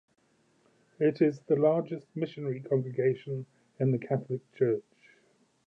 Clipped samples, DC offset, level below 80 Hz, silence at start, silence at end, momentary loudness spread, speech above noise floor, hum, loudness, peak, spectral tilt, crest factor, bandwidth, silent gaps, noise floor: under 0.1%; under 0.1%; -80 dBFS; 1 s; 0.85 s; 12 LU; 39 dB; none; -30 LUFS; -12 dBFS; -10 dB/octave; 18 dB; 7.2 kHz; none; -68 dBFS